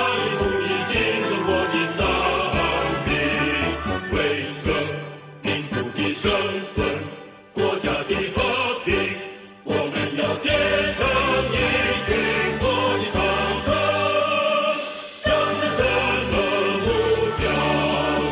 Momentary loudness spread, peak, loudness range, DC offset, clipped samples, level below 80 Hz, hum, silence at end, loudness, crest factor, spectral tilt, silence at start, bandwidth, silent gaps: 6 LU; -8 dBFS; 4 LU; under 0.1%; under 0.1%; -38 dBFS; none; 0 s; -21 LUFS; 14 dB; -9 dB/octave; 0 s; 4 kHz; none